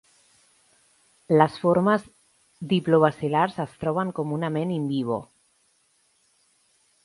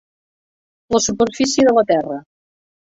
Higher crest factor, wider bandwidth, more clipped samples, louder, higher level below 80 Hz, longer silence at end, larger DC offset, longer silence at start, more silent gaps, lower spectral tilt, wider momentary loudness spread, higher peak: first, 22 dB vs 16 dB; first, 11.5 kHz vs 8.2 kHz; neither; second, -24 LUFS vs -16 LUFS; second, -64 dBFS vs -50 dBFS; first, 1.8 s vs 0.7 s; neither; first, 1.3 s vs 0.9 s; neither; first, -7.5 dB/octave vs -3.5 dB/octave; second, 8 LU vs 11 LU; about the same, -4 dBFS vs -2 dBFS